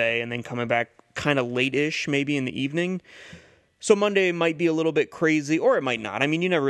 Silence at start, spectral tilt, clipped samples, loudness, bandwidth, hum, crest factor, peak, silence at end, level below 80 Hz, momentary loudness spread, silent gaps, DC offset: 0 s; -5 dB/octave; under 0.1%; -24 LUFS; 12 kHz; none; 20 dB; -4 dBFS; 0 s; -64 dBFS; 7 LU; none; under 0.1%